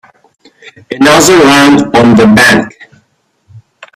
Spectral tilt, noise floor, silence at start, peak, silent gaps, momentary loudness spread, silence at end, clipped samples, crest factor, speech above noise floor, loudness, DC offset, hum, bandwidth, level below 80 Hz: -4 dB/octave; -55 dBFS; 0.9 s; 0 dBFS; none; 7 LU; 0.4 s; 0.6%; 8 dB; 50 dB; -5 LUFS; under 0.1%; none; 16 kHz; -40 dBFS